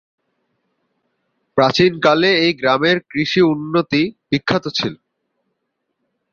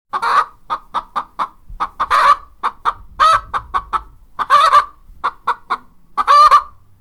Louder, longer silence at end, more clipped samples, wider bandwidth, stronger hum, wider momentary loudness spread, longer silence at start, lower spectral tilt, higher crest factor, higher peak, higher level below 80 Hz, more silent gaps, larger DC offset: about the same, -16 LUFS vs -15 LUFS; first, 1.4 s vs 0.3 s; neither; second, 7.2 kHz vs 14.5 kHz; neither; second, 8 LU vs 16 LU; first, 1.55 s vs 0.15 s; first, -5.5 dB/octave vs -1.5 dB/octave; about the same, 18 dB vs 16 dB; about the same, -2 dBFS vs 0 dBFS; second, -56 dBFS vs -42 dBFS; neither; neither